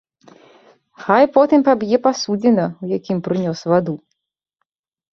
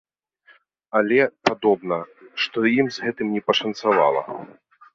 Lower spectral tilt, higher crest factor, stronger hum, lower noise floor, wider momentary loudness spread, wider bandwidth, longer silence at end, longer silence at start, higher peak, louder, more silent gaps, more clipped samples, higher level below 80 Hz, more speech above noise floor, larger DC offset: first, -6.5 dB/octave vs -5 dB/octave; about the same, 18 dB vs 20 dB; neither; first, -75 dBFS vs -57 dBFS; about the same, 11 LU vs 9 LU; about the same, 7.2 kHz vs 7.4 kHz; first, 1.15 s vs 0.5 s; about the same, 1 s vs 0.95 s; about the same, 0 dBFS vs -2 dBFS; first, -17 LUFS vs -21 LUFS; neither; neither; about the same, -62 dBFS vs -66 dBFS; first, 60 dB vs 36 dB; neither